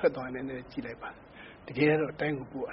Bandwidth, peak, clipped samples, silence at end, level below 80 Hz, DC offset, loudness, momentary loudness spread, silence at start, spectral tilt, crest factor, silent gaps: 5.8 kHz; -12 dBFS; under 0.1%; 0 s; -60 dBFS; under 0.1%; -32 LUFS; 20 LU; 0 s; -5.5 dB/octave; 20 dB; none